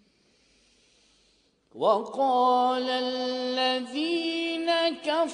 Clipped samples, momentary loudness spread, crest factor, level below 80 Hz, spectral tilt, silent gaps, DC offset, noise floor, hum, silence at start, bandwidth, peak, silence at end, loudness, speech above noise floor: under 0.1%; 6 LU; 18 dB; -76 dBFS; -3 dB/octave; none; under 0.1%; -66 dBFS; none; 1.75 s; 10 kHz; -10 dBFS; 0 s; -26 LUFS; 40 dB